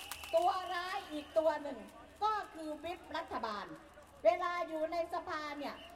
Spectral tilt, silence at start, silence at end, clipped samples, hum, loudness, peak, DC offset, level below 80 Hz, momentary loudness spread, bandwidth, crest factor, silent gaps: -3.5 dB/octave; 0 s; 0 s; under 0.1%; none; -37 LUFS; -18 dBFS; under 0.1%; -68 dBFS; 13 LU; 16 kHz; 20 dB; none